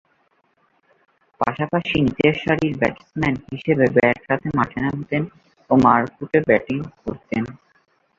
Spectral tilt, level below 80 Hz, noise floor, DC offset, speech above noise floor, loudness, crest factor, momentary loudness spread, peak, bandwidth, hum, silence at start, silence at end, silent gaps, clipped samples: -8 dB/octave; -48 dBFS; -64 dBFS; under 0.1%; 44 dB; -20 LUFS; 20 dB; 10 LU; -2 dBFS; 7.4 kHz; none; 1.4 s; 0.65 s; none; under 0.1%